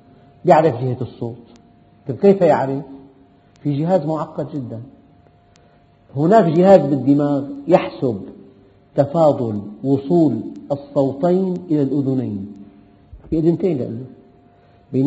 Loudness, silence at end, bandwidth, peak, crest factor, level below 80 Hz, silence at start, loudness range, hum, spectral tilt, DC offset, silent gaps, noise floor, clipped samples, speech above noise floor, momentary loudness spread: -18 LUFS; 0 s; 8 kHz; 0 dBFS; 18 dB; -52 dBFS; 0.45 s; 6 LU; none; -8 dB/octave; under 0.1%; none; -52 dBFS; under 0.1%; 35 dB; 17 LU